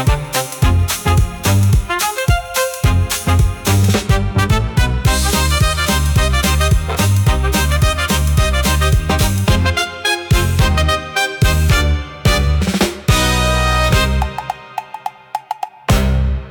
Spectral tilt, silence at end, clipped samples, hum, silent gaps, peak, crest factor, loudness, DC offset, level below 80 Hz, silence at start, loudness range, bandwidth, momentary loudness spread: -4.5 dB/octave; 0 s; under 0.1%; none; none; -2 dBFS; 12 dB; -15 LUFS; under 0.1%; -20 dBFS; 0 s; 1 LU; 18 kHz; 5 LU